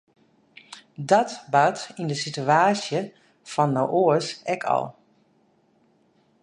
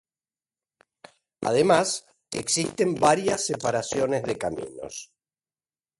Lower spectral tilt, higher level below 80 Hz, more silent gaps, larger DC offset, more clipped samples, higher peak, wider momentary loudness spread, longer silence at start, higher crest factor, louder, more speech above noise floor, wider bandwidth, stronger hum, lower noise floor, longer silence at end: first, -5 dB/octave vs -3.5 dB/octave; second, -72 dBFS vs -60 dBFS; neither; neither; neither; about the same, -4 dBFS vs -6 dBFS; about the same, 17 LU vs 15 LU; second, 0.7 s vs 1.4 s; about the same, 20 dB vs 22 dB; about the same, -23 LUFS vs -25 LUFS; second, 41 dB vs over 66 dB; about the same, 11 kHz vs 11.5 kHz; neither; second, -63 dBFS vs under -90 dBFS; first, 1.5 s vs 0.95 s